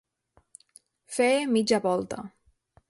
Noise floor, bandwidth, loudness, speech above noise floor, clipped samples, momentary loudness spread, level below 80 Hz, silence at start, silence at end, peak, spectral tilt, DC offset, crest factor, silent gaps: -67 dBFS; 11.5 kHz; -26 LUFS; 42 dB; under 0.1%; 15 LU; -66 dBFS; 1.1 s; 0.6 s; -10 dBFS; -4 dB/octave; under 0.1%; 18 dB; none